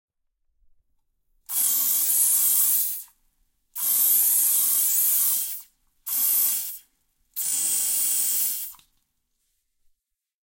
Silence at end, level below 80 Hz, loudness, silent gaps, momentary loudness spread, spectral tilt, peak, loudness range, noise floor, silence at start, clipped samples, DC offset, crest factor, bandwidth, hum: 1.75 s; -72 dBFS; -20 LUFS; none; 16 LU; 3 dB/octave; -8 dBFS; 6 LU; -76 dBFS; 1.5 s; under 0.1%; under 0.1%; 18 dB; 16.5 kHz; none